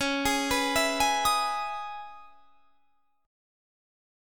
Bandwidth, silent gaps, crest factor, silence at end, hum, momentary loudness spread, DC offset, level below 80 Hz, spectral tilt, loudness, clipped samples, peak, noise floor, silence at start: 19 kHz; none; 18 dB; 1 s; none; 15 LU; 0.3%; -52 dBFS; -1.5 dB/octave; -26 LUFS; under 0.1%; -12 dBFS; -72 dBFS; 0 s